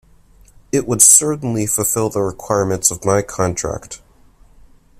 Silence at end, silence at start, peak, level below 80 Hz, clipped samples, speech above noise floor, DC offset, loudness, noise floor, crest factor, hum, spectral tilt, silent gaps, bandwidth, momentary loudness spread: 1.05 s; 0.75 s; 0 dBFS; -44 dBFS; under 0.1%; 32 dB; under 0.1%; -15 LUFS; -48 dBFS; 18 dB; none; -3.5 dB/octave; none; 16 kHz; 17 LU